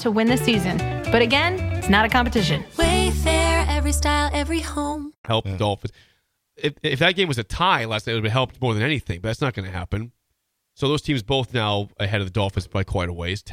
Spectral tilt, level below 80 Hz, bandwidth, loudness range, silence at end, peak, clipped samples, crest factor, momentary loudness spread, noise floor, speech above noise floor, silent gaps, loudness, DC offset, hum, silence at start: -5 dB/octave; -32 dBFS; 16 kHz; 5 LU; 0 s; -2 dBFS; under 0.1%; 18 dB; 10 LU; -74 dBFS; 53 dB; 5.18-5.24 s; -22 LUFS; under 0.1%; none; 0 s